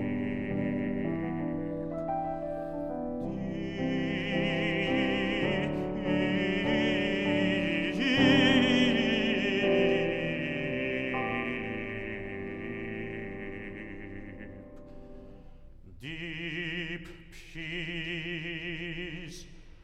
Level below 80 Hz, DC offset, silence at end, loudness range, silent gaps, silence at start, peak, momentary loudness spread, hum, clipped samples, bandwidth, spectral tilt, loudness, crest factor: -50 dBFS; under 0.1%; 0 s; 14 LU; none; 0 s; -10 dBFS; 17 LU; none; under 0.1%; 9 kHz; -6 dB/octave; -30 LUFS; 20 dB